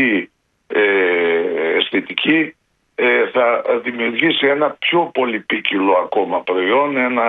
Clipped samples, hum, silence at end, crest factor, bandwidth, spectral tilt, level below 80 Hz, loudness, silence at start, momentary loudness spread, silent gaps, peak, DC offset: under 0.1%; none; 0 s; 16 dB; 4.6 kHz; -7 dB/octave; -66 dBFS; -16 LUFS; 0 s; 5 LU; none; 0 dBFS; under 0.1%